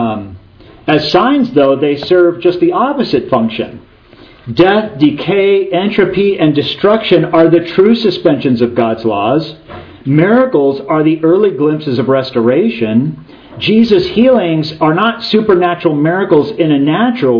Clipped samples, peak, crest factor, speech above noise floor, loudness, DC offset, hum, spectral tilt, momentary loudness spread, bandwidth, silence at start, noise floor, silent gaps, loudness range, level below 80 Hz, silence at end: 0.3%; 0 dBFS; 10 dB; 29 dB; -11 LUFS; under 0.1%; none; -8 dB/octave; 6 LU; 5.4 kHz; 0 s; -39 dBFS; none; 2 LU; -46 dBFS; 0 s